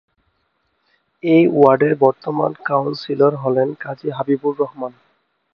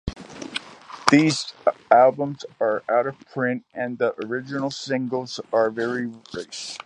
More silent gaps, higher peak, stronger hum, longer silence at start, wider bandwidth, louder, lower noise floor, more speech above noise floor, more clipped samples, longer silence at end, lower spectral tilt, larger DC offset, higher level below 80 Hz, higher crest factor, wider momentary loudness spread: neither; about the same, 0 dBFS vs 0 dBFS; neither; first, 1.25 s vs 0.05 s; second, 5.8 kHz vs 11.5 kHz; first, -17 LUFS vs -23 LUFS; first, -67 dBFS vs -41 dBFS; first, 51 dB vs 19 dB; neither; first, 0.65 s vs 0.1 s; first, -9.5 dB/octave vs -5 dB/octave; neither; second, -64 dBFS vs -52 dBFS; second, 18 dB vs 24 dB; about the same, 13 LU vs 15 LU